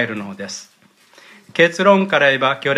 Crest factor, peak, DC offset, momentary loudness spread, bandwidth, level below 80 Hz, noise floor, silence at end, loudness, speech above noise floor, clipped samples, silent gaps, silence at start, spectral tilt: 18 dB; 0 dBFS; under 0.1%; 17 LU; 12 kHz; -66 dBFS; -50 dBFS; 0 s; -15 LUFS; 33 dB; under 0.1%; none; 0 s; -4.5 dB/octave